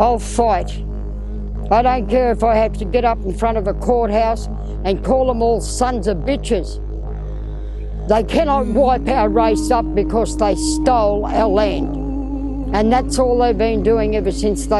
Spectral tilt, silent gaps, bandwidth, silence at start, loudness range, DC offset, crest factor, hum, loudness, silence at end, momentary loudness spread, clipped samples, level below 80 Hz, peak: -6 dB/octave; none; 12 kHz; 0 s; 4 LU; under 0.1%; 16 dB; none; -17 LUFS; 0 s; 13 LU; under 0.1%; -24 dBFS; 0 dBFS